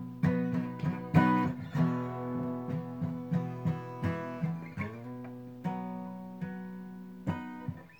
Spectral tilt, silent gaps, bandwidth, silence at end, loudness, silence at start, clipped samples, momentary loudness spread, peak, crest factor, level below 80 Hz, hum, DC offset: -9 dB/octave; none; 18.5 kHz; 0.05 s; -34 LUFS; 0 s; under 0.1%; 14 LU; -12 dBFS; 22 dB; -66 dBFS; none; under 0.1%